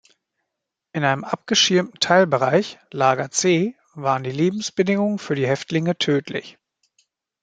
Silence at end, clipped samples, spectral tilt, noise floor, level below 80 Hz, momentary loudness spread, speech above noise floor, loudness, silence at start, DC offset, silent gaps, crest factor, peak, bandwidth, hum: 0.9 s; under 0.1%; -4 dB/octave; -82 dBFS; -66 dBFS; 10 LU; 62 dB; -20 LUFS; 0.95 s; under 0.1%; none; 20 dB; -2 dBFS; 9.4 kHz; none